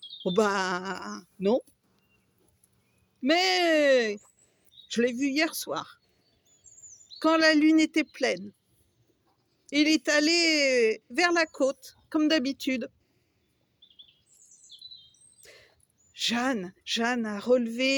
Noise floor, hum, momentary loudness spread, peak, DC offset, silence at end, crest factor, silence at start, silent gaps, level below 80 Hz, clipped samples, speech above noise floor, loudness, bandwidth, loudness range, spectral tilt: -72 dBFS; none; 16 LU; -10 dBFS; under 0.1%; 0 s; 18 dB; 0 s; none; -74 dBFS; under 0.1%; 46 dB; -25 LUFS; 19.5 kHz; 8 LU; -3 dB/octave